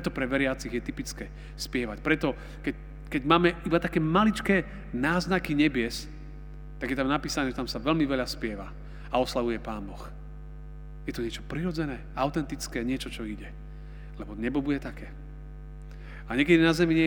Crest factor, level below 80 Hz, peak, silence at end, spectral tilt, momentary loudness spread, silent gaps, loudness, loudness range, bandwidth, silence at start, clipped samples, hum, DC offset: 24 dB; -42 dBFS; -6 dBFS; 0 s; -5.5 dB/octave; 21 LU; none; -28 LUFS; 8 LU; over 20 kHz; 0 s; under 0.1%; none; under 0.1%